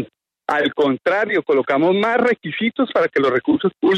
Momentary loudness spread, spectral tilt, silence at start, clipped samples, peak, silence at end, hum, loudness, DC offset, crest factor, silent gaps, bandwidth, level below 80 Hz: 5 LU; -6.5 dB/octave; 0 s; under 0.1%; -6 dBFS; 0 s; none; -18 LUFS; under 0.1%; 12 dB; none; 9.4 kHz; -62 dBFS